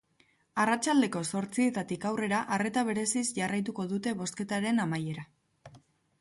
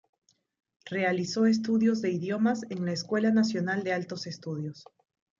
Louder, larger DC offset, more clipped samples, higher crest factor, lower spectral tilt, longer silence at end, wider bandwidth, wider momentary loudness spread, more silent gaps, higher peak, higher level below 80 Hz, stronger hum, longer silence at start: about the same, -30 LUFS vs -28 LUFS; neither; neither; about the same, 16 dB vs 14 dB; second, -4.5 dB/octave vs -6 dB/octave; second, 0.4 s vs 0.6 s; first, 11.5 kHz vs 7.6 kHz; second, 7 LU vs 11 LU; neither; about the same, -14 dBFS vs -14 dBFS; about the same, -72 dBFS vs -76 dBFS; neither; second, 0.55 s vs 0.85 s